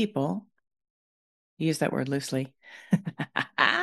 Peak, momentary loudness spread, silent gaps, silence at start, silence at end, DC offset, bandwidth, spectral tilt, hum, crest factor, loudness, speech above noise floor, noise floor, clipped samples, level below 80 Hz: -4 dBFS; 10 LU; 0.90-1.57 s; 0 s; 0 s; under 0.1%; 12.5 kHz; -5 dB/octave; none; 24 dB; -29 LUFS; over 62 dB; under -90 dBFS; under 0.1%; -72 dBFS